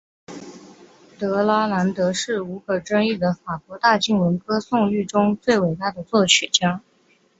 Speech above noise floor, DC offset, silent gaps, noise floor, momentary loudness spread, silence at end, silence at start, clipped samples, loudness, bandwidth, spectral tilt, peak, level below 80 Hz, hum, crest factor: 40 dB; under 0.1%; none; -60 dBFS; 13 LU; 0.6 s; 0.3 s; under 0.1%; -20 LUFS; 8 kHz; -4 dB/octave; -2 dBFS; -58 dBFS; none; 20 dB